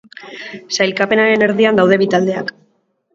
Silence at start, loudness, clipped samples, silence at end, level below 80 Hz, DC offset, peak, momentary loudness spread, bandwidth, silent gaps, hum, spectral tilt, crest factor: 0.2 s; -14 LUFS; under 0.1%; 0.65 s; -60 dBFS; under 0.1%; 0 dBFS; 18 LU; 7.8 kHz; none; none; -5 dB/octave; 16 dB